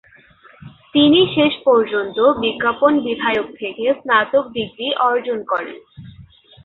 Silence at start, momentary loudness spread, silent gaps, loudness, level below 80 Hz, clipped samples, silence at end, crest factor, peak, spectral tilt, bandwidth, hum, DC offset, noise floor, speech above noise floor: 0.65 s; 10 LU; none; -17 LUFS; -56 dBFS; under 0.1%; 0.4 s; 16 dB; -2 dBFS; -8 dB/octave; 4.2 kHz; none; under 0.1%; -48 dBFS; 31 dB